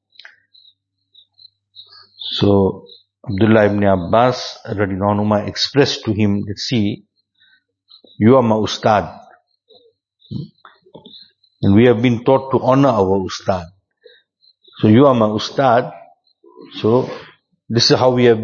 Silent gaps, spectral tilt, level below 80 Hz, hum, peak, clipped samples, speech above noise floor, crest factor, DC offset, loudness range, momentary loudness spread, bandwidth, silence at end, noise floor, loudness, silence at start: none; -6 dB/octave; -52 dBFS; none; 0 dBFS; under 0.1%; 43 dB; 18 dB; under 0.1%; 4 LU; 17 LU; 7.4 kHz; 0 s; -57 dBFS; -15 LUFS; 2.2 s